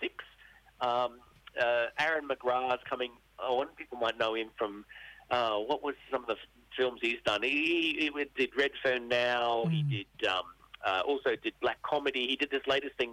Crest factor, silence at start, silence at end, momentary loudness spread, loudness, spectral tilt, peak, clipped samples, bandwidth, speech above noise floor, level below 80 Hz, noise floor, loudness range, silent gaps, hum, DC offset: 14 dB; 0 s; 0 s; 9 LU; -32 LUFS; -5.5 dB/octave; -18 dBFS; under 0.1%; 15 kHz; 27 dB; -66 dBFS; -59 dBFS; 4 LU; none; none; under 0.1%